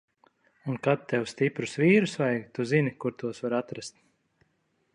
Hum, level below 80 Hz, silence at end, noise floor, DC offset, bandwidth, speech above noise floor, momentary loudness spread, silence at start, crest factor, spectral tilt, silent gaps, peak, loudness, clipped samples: none; -72 dBFS; 1.05 s; -73 dBFS; under 0.1%; 11 kHz; 46 dB; 15 LU; 0.65 s; 20 dB; -6.5 dB/octave; none; -10 dBFS; -27 LUFS; under 0.1%